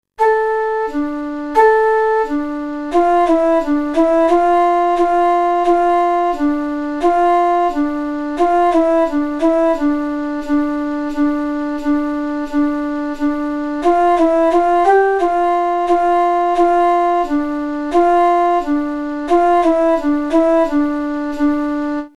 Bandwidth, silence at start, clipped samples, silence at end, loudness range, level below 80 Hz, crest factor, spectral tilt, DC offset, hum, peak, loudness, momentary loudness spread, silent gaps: 11 kHz; 0.2 s; under 0.1%; 0.1 s; 4 LU; -40 dBFS; 14 dB; -5 dB/octave; under 0.1%; none; 0 dBFS; -15 LUFS; 8 LU; none